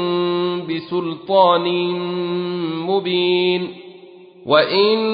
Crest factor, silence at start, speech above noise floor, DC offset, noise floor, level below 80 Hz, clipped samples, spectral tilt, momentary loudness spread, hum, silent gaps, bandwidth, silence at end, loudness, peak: 16 dB; 0 s; 24 dB; under 0.1%; -42 dBFS; -66 dBFS; under 0.1%; -10.5 dB/octave; 10 LU; none; none; 5.2 kHz; 0 s; -18 LUFS; -2 dBFS